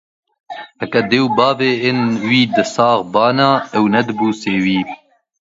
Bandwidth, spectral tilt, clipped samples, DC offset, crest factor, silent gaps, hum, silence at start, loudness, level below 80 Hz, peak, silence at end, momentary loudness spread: 7.8 kHz; -5.5 dB/octave; under 0.1%; under 0.1%; 16 dB; none; none; 0.5 s; -15 LUFS; -58 dBFS; 0 dBFS; 0.55 s; 14 LU